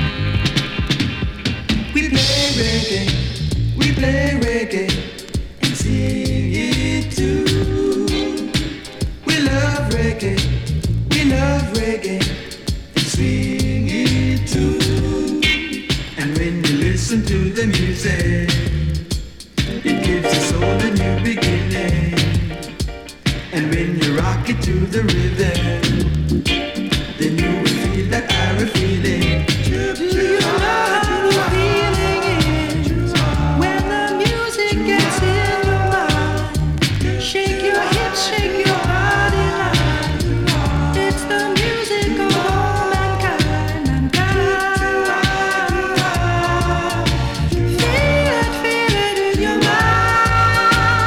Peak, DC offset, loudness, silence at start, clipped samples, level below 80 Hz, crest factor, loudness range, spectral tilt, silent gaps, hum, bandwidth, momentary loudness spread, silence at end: -6 dBFS; under 0.1%; -17 LUFS; 0 s; under 0.1%; -26 dBFS; 10 dB; 3 LU; -5 dB/octave; none; none; 18 kHz; 5 LU; 0 s